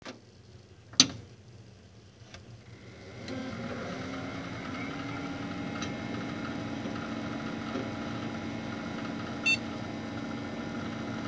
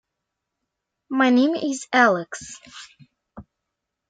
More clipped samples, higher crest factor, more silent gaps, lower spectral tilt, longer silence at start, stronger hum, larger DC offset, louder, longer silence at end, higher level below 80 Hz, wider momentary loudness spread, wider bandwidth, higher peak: neither; first, 34 dB vs 20 dB; neither; about the same, -3 dB/octave vs -4 dB/octave; second, 0 s vs 1.1 s; neither; neither; second, -33 LUFS vs -20 LUFS; second, 0 s vs 0.7 s; first, -58 dBFS vs -64 dBFS; about the same, 24 LU vs 22 LU; second, 8 kHz vs 9.2 kHz; about the same, -2 dBFS vs -4 dBFS